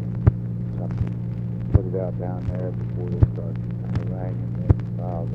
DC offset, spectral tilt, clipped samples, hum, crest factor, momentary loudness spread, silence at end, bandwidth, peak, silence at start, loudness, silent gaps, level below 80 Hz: under 0.1%; -11.5 dB/octave; under 0.1%; none; 22 dB; 7 LU; 0 s; 3.4 kHz; 0 dBFS; 0 s; -25 LUFS; none; -34 dBFS